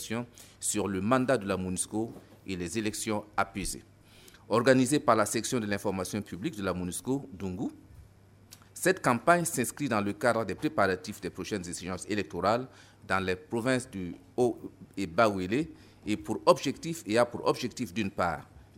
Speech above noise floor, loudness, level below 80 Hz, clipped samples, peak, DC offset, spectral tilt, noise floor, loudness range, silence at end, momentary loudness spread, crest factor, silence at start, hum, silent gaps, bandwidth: 27 dB; -30 LUFS; -58 dBFS; under 0.1%; -8 dBFS; under 0.1%; -4.5 dB/octave; -57 dBFS; 4 LU; 0.15 s; 13 LU; 24 dB; 0 s; none; none; 16 kHz